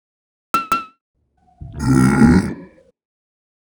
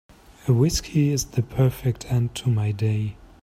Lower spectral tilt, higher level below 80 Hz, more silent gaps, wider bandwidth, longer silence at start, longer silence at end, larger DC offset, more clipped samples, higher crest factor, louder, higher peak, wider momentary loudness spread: about the same, -7 dB/octave vs -6 dB/octave; first, -34 dBFS vs -42 dBFS; first, 1.01-1.14 s vs none; first, over 20 kHz vs 16 kHz; about the same, 0.55 s vs 0.45 s; first, 1.1 s vs 0.3 s; neither; neither; about the same, 20 dB vs 16 dB; first, -16 LUFS vs -23 LUFS; first, 0 dBFS vs -8 dBFS; first, 18 LU vs 7 LU